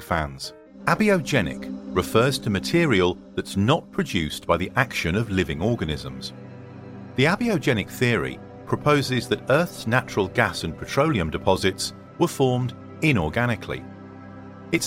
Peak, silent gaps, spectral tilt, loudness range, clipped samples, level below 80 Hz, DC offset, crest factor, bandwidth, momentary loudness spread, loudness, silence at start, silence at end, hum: -4 dBFS; none; -5.5 dB/octave; 3 LU; under 0.1%; -46 dBFS; under 0.1%; 20 dB; 16.5 kHz; 15 LU; -23 LUFS; 0 s; 0 s; none